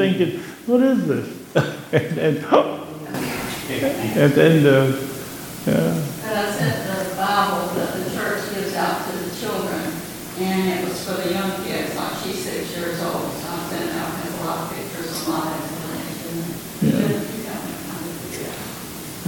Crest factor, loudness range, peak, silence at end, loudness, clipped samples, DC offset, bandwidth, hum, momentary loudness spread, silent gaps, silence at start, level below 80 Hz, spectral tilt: 22 dB; 7 LU; 0 dBFS; 0 s; -22 LUFS; under 0.1%; under 0.1%; 17.5 kHz; none; 12 LU; none; 0 s; -54 dBFS; -5.5 dB/octave